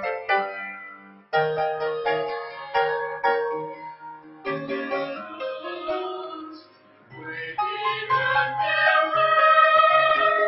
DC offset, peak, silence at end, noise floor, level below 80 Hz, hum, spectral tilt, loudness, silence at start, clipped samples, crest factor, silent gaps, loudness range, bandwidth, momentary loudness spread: under 0.1%; -6 dBFS; 0 s; -53 dBFS; -68 dBFS; none; -6.5 dB/octave; -22 LUFS; 0 s; under 0.1%; 18 dB; none; 12 LU; 5.8 kHz; 20 LU